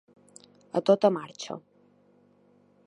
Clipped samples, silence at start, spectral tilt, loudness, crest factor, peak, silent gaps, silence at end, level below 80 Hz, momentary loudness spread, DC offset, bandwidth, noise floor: under 0.1%; 0.75 s; -6 dB/octave; -27 LUFS; 24 dB; -8 dBFS; none; 1.3 s; -82 dBFS; 17 LU; under 0.1%; 11 kHz; -62 dBFS